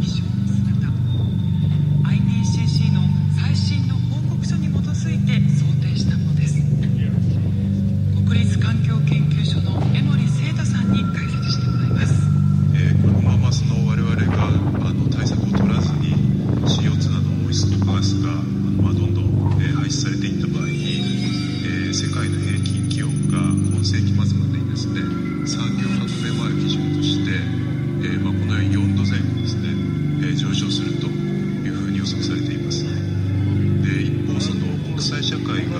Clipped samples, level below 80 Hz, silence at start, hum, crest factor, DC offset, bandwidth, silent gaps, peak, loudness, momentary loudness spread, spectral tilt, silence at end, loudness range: under 0.1%; -38 dBFS; 0 s; none; 14 dB; under 0.1%; 10.5 kHz; none; -6 dBFS; -20 LUFS; 5 LU; -6.5 dB/octave; 0 s; 4 LU